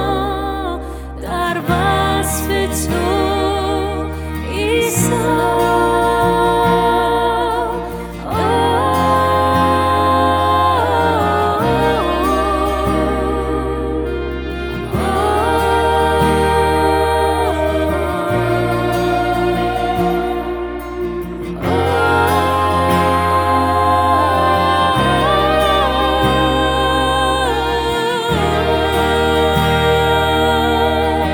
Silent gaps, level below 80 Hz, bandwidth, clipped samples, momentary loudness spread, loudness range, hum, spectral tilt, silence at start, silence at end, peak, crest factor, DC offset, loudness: none; -28 dBFS; over 20 kHz; under 0.1%; 8 LU; 4 LU; none; -5 dB/octave; 0 s; 0 s; -2 dBFS; 14 dB; under 0.1%; -15 LUFS